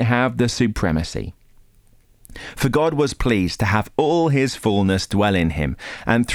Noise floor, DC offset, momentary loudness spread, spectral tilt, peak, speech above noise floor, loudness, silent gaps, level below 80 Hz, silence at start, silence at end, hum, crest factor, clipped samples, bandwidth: -53 dBFS; under 0.1%; 10 LU; -6 dB/octave; -4 dBFS; 34 dB; -20 LUFS; none; -36 dBFS; 0 s; 0 s; none; 16 dB; under 0.1%; 18 kHz